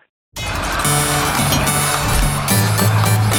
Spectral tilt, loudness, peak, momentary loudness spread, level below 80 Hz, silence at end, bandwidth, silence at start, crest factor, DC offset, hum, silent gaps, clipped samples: -3.5 dB/octave; -16 LUFS; -2 dBFS; 8 LU; -28 dBFS; 0 s; over 20 kHz; 0.35 s; 14 dB; under 0.1%; none; none; under 0.1%